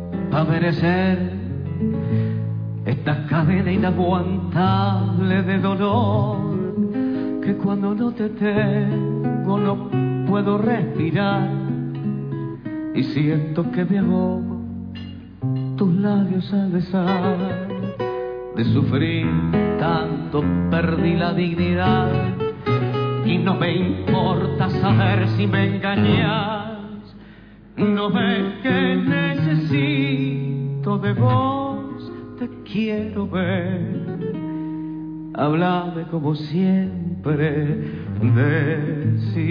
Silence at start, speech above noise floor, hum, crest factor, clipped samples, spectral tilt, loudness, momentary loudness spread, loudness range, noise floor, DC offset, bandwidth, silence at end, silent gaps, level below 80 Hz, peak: 0 s; 24 dB; none; 14 dB; under 0.1%; -10 dB/octave; -21 LUFS; 9 LU; 3 LU; -43 dBFS; under 0.1%; 5.4 kHz; 0 s; none; -48 dBFS; -6 dBFS